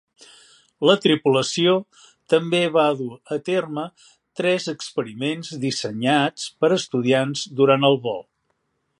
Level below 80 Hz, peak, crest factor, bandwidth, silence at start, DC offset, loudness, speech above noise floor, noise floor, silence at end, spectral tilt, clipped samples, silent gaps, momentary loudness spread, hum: -70 dBFS; -2 dBFS; 20 dB; 11.5 kHz; 0.8 s; under 0.1%; -21 LUFS; 51 dB; -72 dBFS; 0.75 s; -5 dB/octave; under 0.1%; none; 11 LU; none